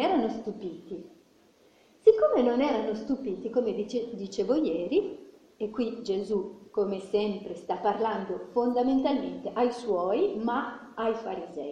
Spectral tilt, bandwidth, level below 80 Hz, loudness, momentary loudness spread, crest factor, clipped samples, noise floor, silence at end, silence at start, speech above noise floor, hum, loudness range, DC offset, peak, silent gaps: -6.5 dB/octave; 9.4 kHz; -64 dBFS; -29 LUFS; 13 LU; 22 dB; under 0.1%; -61 dBFS; 0 s; 0 s; 32 dB; none; 4 LU; under 0.1%; -8 dBFS; none